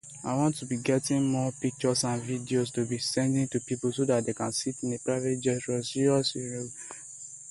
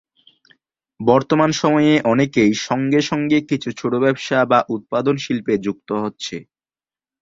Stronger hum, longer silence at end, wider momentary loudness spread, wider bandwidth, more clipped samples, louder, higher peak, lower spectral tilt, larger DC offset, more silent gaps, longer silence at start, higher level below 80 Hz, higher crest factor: neither; second, 0 s vs 0.8 s; about the same, 9 LU vs 9 LU; first, 11.5 kHz vs 7.8 kHz; neither; second, -29 LUFS vs -18 LUFS; second, -12 dBFS vs 0 dBFS; about the same, -5 dB/octave vs -5.5 dB/octave; neither; neither; second, 0.05 s vs 1 s; second, -64 dBFS vs -58 dBFS; about the same, 16 dB vs 18 dB